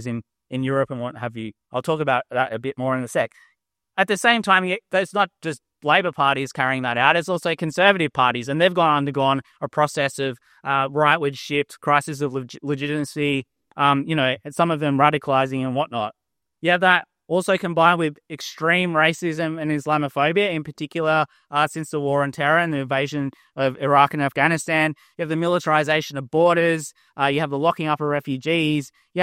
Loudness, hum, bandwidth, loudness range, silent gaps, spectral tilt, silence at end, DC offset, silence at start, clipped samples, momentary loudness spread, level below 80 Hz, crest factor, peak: -21 LUFS; none; 16 kHz; 3 LU; none; -5 dB/octave; 0 s; under 0.1%; 0 s; under 0.1%; 11 LU; -66 dBFS; 22 dB; 0 dBFS